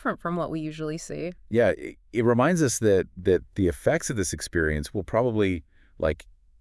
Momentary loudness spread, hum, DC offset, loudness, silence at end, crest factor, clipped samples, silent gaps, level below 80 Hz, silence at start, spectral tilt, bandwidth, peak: 11 LU; none; under 0.1%; -26 LUFS; 0.4 s; 18 dB; under 0.1%; none; -46 dBFS; 0 s; -5.5 dB/octave; 12 kHz; -8 dBFS